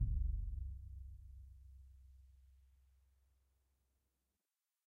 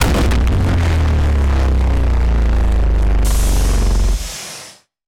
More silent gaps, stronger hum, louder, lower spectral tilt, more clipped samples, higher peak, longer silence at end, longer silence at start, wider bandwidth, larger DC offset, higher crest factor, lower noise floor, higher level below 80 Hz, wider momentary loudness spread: neither; neither; second, -47 LUFS vs -16 LUFS; first, -9.5 dB/octave vs -5.5 dB/octave; neither; second, -26 dBFS vs -2 dBFS; first, 2.3 s vs 0.35 s; about the same, 0 s vs 0 s; second, 0.5 kHz vs 15.5 kHz; neither; first, 20 dB vs 10 dB; first, under -90 dBFS vs -39 dBFS; second, -48 dBFS vs -14 dBFS; first, 24 LU vs 6 LU